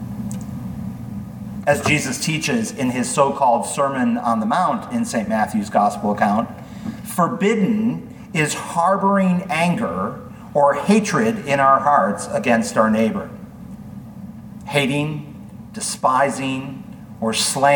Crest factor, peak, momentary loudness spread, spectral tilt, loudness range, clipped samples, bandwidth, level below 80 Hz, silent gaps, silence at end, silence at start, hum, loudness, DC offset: 18 dB; -2 dBFS; 17 LU; -5 dB/octave; 5 LU; under 0.1%; 19 kHz; -52 dBFS; none; 0 s; 0 s; none; -19 LUFS; under 0.1%